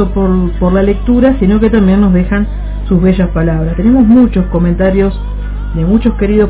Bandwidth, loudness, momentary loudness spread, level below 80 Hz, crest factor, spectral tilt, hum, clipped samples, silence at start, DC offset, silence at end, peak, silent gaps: 4 kHz; -10 LUFS; 8 LU; -18 dBFS; 10 dB; -12.5 dB/octave; 50 Hz at -15 dBFS; 0.7%; 0 s; under 0.1%; 0 s; 0 dBFS; none